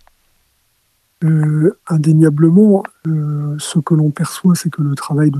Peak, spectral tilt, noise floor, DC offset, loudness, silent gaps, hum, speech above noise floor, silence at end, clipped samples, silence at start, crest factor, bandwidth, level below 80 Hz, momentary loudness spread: 0 dBFS; -7.5 dB/octave; -61 dBFS; under 0.1%; -14 LUFS; none; none; 48 dB; 0 s; under 0.1%; 1.2 s; 14 dB; 13 kHz; -64 dBFS; 9 LU